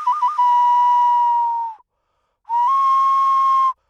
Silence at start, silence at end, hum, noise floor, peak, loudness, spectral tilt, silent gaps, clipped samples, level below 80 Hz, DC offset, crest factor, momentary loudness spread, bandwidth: 0 s; 0.2 s; none; -70 dBFS; -10 dBFS; -16 LUFS; 3 dB/octave; none; under 0.1%; -78 dBFS; under 0.1%; 8 dB; 8 LU; 7.2 kHz